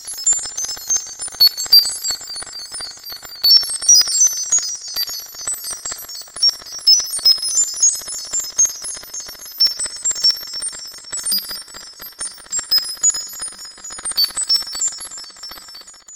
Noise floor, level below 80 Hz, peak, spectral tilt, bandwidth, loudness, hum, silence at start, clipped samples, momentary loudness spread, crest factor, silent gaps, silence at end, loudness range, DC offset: -39 dBFS; -56 dBFS; 0 dBFS; 3.5 dB/octave; 17 kHz; -15 LUFS; none; 0 s; under 0.1%; 19 LU; 20 dB; none; 0 s; 6 LU; under 0.1%